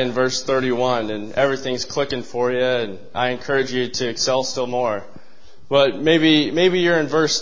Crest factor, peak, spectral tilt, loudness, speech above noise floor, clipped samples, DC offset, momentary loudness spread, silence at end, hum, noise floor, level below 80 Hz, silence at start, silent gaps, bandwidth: 18 dB; -2 dBFS; -4 dB/octave; -20 LUFS; 32 dB; under 0.1%; 2%; 8 LU; 0 s; none; -52 dBFS; -54 dBFS; 0 s; none; 7.6 kHz